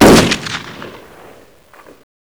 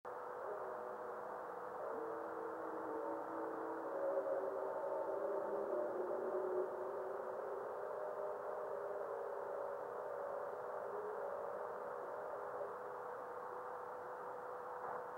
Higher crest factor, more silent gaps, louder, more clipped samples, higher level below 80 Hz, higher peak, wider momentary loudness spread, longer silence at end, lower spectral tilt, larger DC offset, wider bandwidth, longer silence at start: about the same, 14 dB vs 18 dB; neither; first, -12 LUFS vs -45 LUFS; neither; first, -32 dBFS vs -86 dBFS; first, 0 dBFS vs -28 dBFS; first, 25 LU vs 6 LU; first, 1.45 s vs 0 s; second, -4.5 dB/octave vs -6.5 dB/octave; first, 0.3% vs under 0.1%; first, over 20 kHz vs 16.5 kHz; about the same, 0 s vs 0.05 s